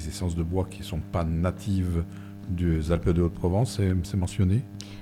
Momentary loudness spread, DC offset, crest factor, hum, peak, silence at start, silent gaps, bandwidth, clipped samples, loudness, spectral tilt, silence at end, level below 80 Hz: 8 LU; under 0.1%; 16 dB; none; -10 dBFS; 0 s; none; 14 kHz; under 0.1%; -27 LUFS; -7.5 dB/octave; 0 s; -38 dBFS